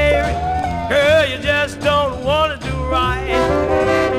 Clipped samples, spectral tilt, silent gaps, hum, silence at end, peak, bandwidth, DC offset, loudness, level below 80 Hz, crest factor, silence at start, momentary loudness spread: under 0.1%; -5 dB/octave; none; none; 0 s; -2 dBFS; 15.5 kHz; 0.2%; -17 LUFS; -28 dBFS; 14 dB; 0 s; 6 LU